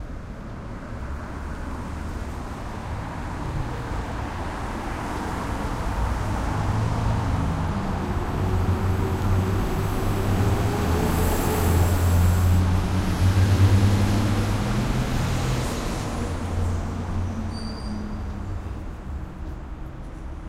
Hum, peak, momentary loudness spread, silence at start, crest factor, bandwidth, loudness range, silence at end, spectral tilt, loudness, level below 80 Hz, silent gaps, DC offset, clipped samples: none; -6 dBFS; 14 LU; 0 s; 16 dB; 16 kHz; 11 LU; 0 s; -6.5 dB/octave; -25 LUFS; -30 dBFS; none; under 0.1%; under 0.1%